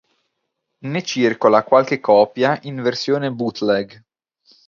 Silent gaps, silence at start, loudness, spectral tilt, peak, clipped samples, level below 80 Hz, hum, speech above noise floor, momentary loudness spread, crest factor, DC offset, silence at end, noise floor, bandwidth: none; 0.85 s; -18 LUFS; -5.5 dB/octave; 0 dBFS; under 0.1%; -66 dBFS; none; 58 dB; 10 LU; 18 dB; under 0.1%; 0.8 s; -75 dBFS; 7.4 kHz